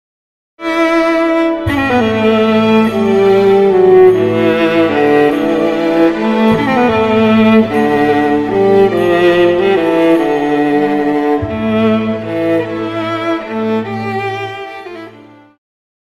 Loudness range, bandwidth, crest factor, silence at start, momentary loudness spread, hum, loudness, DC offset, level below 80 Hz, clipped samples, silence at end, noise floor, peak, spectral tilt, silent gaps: 6 LU; 13.5 kHz; 12 dB; 0.6 s; 9 LU; none; -11 LUFS; under 0.1%; -42 dBFS; under 0.1%; 0.85 s; -38 dBFS; 0 dBFS; -7 dB/octave; none